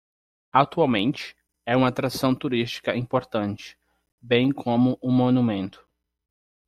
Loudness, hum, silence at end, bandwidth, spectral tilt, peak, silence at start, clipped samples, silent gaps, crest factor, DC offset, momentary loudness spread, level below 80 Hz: -23 LUFS; none; 1 s; 14.5 kHz; -6.5 dB/octave; -4 dBFS; 0.55 s; under 0.1%; 4.12-4.18 s; 20 dB; under 0.1%; 13 LU; -58 dBFS